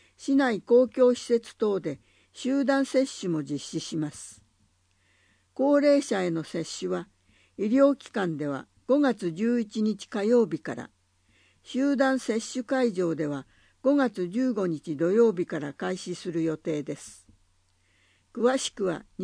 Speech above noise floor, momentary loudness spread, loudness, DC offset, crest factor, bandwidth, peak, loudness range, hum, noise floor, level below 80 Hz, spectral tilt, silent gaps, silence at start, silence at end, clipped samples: 41 dB; 13 LU; -27 LUFS; under 0.1%; 18 dB; 10.5 kHz; -10 dBFS; 4 LU; none; -67 dBFS; -70 dBFS; -5.5 dB/octave; none; 0.2 s; 0 s; under 0.1%